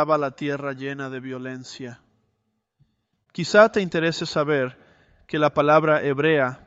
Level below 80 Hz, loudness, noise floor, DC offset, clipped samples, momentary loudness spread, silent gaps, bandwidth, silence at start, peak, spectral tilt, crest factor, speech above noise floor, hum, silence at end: -62 dBFS; -21 LUFS; -74 dBFS; under 0.1%; under 0.1%; 18 LU; none; 8 kHz; 0 s; -2 dBFS; -5.5 dB/octave; 20 dB; 53 dB; none; 0.1 s